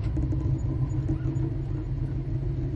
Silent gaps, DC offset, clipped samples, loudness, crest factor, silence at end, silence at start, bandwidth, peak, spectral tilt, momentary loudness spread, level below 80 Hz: none; under 0.1%; under 0.1%; -29 LUFS; 12 dB; 0 s; 0 s; 7.4 kHz; -16 dBFS; -10 dB/octave; 3 LU; -34 dBFS